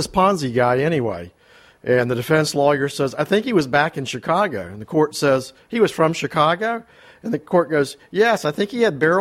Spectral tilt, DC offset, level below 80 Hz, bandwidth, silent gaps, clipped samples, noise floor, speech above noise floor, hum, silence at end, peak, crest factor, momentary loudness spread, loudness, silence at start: -5.5 dB/octave; under 0.1%; -54 dBFS; 15.5 kHz; none; under 0.1%; -49 dBFS; 30 dB; none; 0 s; -4 dBFS; 16 dB; 9 LU; -19 LUFS; 0 s